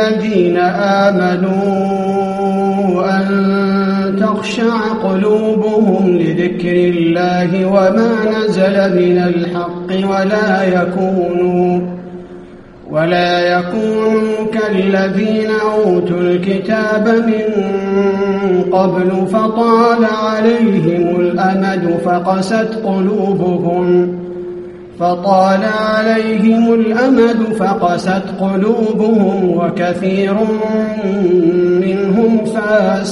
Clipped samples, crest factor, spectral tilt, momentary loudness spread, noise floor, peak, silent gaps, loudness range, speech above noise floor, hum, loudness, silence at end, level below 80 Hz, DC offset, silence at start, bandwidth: under 0.1%; 12 dB; -7.5 dB/octave; 5 LU; -34 dBFS; 0 dBFS; none; 3 LU; 22 dB; none; -13 LUFS; 0 s; -50 dBFS; under 0.1%; 0 s; 11.5 kHz